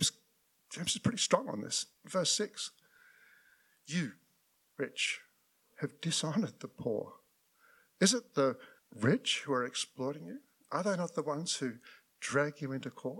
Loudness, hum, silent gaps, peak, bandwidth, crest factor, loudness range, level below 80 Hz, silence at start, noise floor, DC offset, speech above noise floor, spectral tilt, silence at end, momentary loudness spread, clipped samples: -34 LUFS; none; none; -12 dBFS; 17.5 kHz; 24 dB; 5 LU; -76 dBFS; 0 s; -74 dBFS; under 0.1%; 39 dB; -3.5 dB/octave; 0 s; 13 LU; under 0.1%